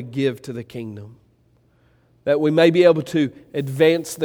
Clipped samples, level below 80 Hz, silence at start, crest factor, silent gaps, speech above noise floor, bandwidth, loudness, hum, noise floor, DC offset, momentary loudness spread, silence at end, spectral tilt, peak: under 0.1%; -64 dBFS; 0 s; 18 dB; none; 40 dB; 18 kHz; -18 LUFS; none; -59 dBFS; under 0.1%; 18 LU; 0 s; -6 dB/octave; -2 dBFS